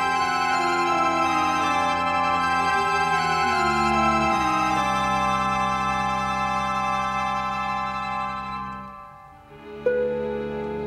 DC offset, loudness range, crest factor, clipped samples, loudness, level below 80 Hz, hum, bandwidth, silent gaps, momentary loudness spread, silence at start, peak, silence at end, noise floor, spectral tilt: under 0.1%; 7 LU; 14 dB; under 0.1%; -23 LUFS; -46 dBFS; none; 15 kHz; none; 8 LU; 0 s; -10 dBFS; 0 s; -45 dBFS; -4 dB/octave